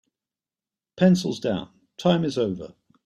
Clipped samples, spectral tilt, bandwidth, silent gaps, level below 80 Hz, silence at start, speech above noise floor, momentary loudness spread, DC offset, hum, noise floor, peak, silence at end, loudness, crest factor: under 0.1%; -6.5 dB/octave; 11 kHz; none; -62 dBFS; 0.95 s; over 68 dB; 17 LU; under 0.1%; none; under -90 dBFS; -6 dBFS; 0.35 s; -23 LUFS; 18 dB